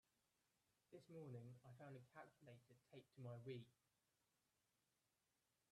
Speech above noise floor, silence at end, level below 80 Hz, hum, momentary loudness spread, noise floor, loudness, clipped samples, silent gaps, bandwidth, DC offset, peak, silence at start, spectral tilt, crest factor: 29 dB; 2 s; under -90 dBFS; none; 11 LU; -90 dBFS; -61 LUFS; under 0.1%; none; 12.5 kHz; under 0.1%; -44 dBFS; 0.9 s; -7 dB/octave; 20 dB